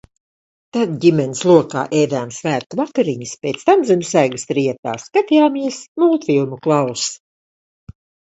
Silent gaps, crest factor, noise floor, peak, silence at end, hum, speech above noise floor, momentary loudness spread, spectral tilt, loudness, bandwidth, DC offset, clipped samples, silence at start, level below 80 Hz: 2.66-2.70 s, 4.79-4.83 s, 5.88-5.95 s; 18 dB; under -90 dBFS; 0 dBFS; 1.2 s; none; over 74 dB; 10 LU; -5.5 dB/octave; -17 LUFS; 8.2 kHz; under 0.1%; under 0.1%; 0.75 s; -58 dBFS